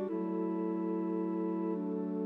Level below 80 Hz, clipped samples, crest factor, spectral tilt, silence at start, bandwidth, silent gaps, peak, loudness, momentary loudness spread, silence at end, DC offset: -88 dBFS; under 0.1%; 10 dB; -11.5 dB/octave; 0 s; 3.7 kHz; none; -26 dBFS; -35 LUFS; 1 LU; 0 s; under 0.1%